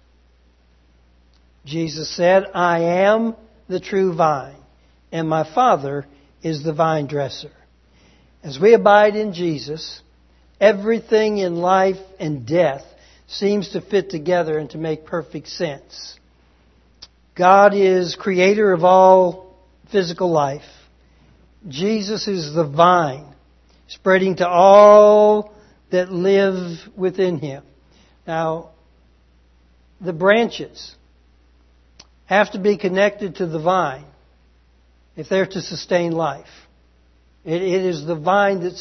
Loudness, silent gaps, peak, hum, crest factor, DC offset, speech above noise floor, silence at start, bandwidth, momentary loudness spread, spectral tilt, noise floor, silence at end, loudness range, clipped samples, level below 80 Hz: -17 LUFS; none; 0 dBFS; none; 18 dB; under 0.1%; 38 dB; 1.65 s; 6.4 kHz; 19 LU; -6 dB/octave; -55 dBFS; 0 s; 10 LU; under 0.1%; -56 dBFS